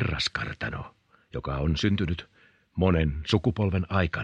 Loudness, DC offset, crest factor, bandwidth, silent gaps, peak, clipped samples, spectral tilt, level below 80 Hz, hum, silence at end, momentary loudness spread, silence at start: -27 LUFS; under 0.1%; 20 dB; 9.6 kHz; none; -8 dBFS; under 0.1%; -6 dB/octave; -40 dBFS; none; 0 s; 13 LU; 0 s